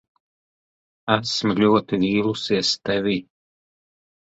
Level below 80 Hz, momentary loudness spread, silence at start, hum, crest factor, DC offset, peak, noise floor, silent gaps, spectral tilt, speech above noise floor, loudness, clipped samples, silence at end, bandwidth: -58 dBFS; 6 LU; 1.05 s; none; 20 dB; under 0.1%; -2 dBFS; under -90 dBFS; none; -5 dB/octave; over 69 dB; -21 LUFS; under 0.1%; 1.1 s; 8 kHz